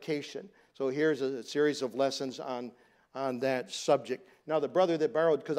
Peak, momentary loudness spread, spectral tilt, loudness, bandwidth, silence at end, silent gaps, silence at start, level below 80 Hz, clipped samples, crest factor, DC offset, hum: -14 dBFS; 12 LU; -4.5 dB/octave; -31 LUFS; 14 kHz; 0 s; none; 0 s; -84 dBFS; under 0.1%; 18 dB; under 0.1%; none